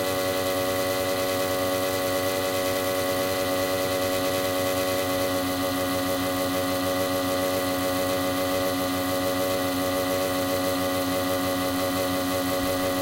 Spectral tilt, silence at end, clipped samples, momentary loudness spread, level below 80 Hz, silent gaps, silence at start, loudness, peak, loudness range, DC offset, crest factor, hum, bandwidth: -3.5 dB/octave; 0 s; under 0.1%; 1 LU; -54 dBFS; none; 0 s; -25 LUFS; -12 dBFS; 0 LU; under 0.1%; 14 dB; none; 16 kHz